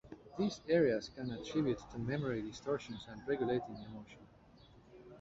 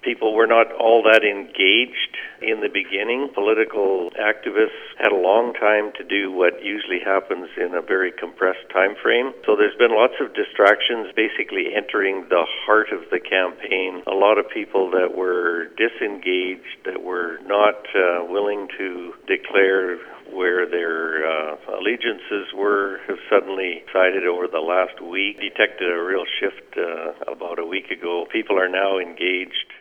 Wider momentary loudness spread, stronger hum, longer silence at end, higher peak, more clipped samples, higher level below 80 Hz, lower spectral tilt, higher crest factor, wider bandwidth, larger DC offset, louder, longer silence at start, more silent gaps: first, 19 LU vs 10 LU; neither; about the same, 0 s vs 0 s; second, -20 dBFS vs 0 dBFS; neither; first, -64 dBFS vs -72 dBFS; first, -6 dB/octave vs -4.5 dB/octave; about the same, 20 dB vs 20 dB; first, 8 kHz vs 6.6 kHz; neither; second, -38 LUFS vs -20 LUFS; about the same, 0.05 s vs 0.05 s; neither